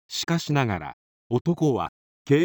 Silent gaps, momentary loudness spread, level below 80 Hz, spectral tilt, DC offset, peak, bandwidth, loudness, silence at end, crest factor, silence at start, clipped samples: 0.93-1.30 s, 1.41-1.45 s, 1.89-2.25 s; 9 LU; -56 dBFS; -6 dB/octave; under 0.1%; -8 dBFS; over 20 kHz; -25 LUFS; 0 s; 18 dB; 0.1 s; under 0.1%